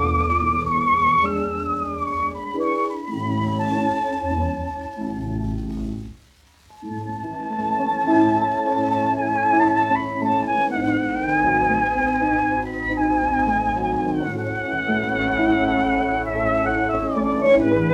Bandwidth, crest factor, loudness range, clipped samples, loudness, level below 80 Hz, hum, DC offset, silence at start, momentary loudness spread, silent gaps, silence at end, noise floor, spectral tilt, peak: 10.5 kHz; 16 dB; 6 LU; under 0.1%; -21 LUFS; -40 dBFS; none; under 0.1%; 0 s; 11 LU; none; 0 s; -53 dBFS; -7.5 dB/octave; -4 dBFS